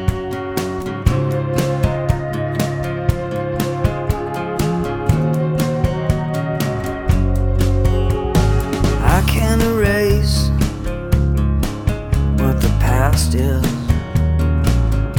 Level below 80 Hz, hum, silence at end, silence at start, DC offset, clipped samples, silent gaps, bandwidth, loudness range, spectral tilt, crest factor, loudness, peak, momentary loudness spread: -22 dBFS; none; 0 s; 0 s; under 0.1%; under 0.1%; none; 18 kHz; 4 LU; -6.5 dB/octave; 16 dB; -18 LUFS; 0 dBFS; 6 LU